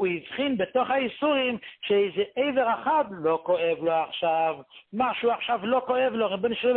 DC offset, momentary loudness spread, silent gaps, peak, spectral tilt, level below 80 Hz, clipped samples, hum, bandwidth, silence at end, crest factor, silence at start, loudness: under 0.1%; 4 LU; none; -12 dBFS; -9 dB/octave; -66 dBFS; under 0.1%; none; 4.3 kHz; 0 s; 14 dB; 0 s; -26 LUFS